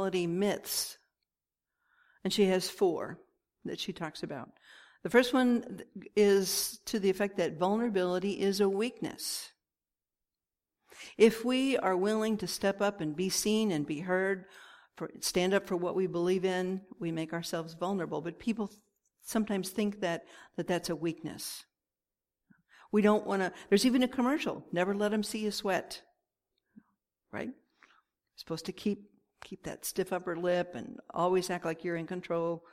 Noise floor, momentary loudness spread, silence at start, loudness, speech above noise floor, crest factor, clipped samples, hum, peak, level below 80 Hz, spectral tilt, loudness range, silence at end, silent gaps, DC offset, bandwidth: under -90 dBFS; 14 LU; 0 s; -32 LUFS; over 59 dB; 22 dB; under 0.1%; none; -10 dBFS; -68 dBFS; -4.5 dB/octave; 7 LU; 0.15 s; none; under 0.1%; 16 kHz